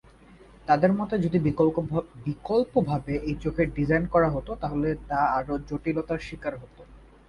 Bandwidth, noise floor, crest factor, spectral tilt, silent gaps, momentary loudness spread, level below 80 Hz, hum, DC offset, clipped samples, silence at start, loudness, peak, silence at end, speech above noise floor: 11 kHz; -52 dBFS; 20 dB; -9 dB/octave; none; 11 LU; -44 dBFS; none; under 0.1%; under 0.1%; 0.65 s; -26 LUFS; -8 dBFS; 0.3 s; 26 dB